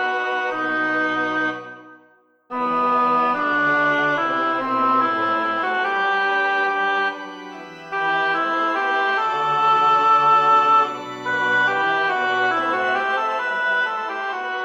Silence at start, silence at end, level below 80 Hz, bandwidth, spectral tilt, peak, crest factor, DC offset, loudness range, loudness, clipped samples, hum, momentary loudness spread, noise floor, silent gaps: 0 s; 0 s; -72 dBFS; 8.4 kHz; -4 dB/octave; -6 dBFS; 14 dB; under 0.1%; 4 LU; -19 LUFS; under 0.1%; none; 10 LU; -56 dBFS; none